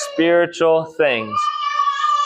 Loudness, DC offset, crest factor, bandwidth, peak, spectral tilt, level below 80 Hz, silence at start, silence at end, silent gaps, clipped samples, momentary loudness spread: -17 LUFS; under 0.1%; 12 dB; 11.5 kHz; -4 dBFS; -4 dB/octave; -68 dBFS; 0 s; 0 s; none; under 0.1%; 4 LU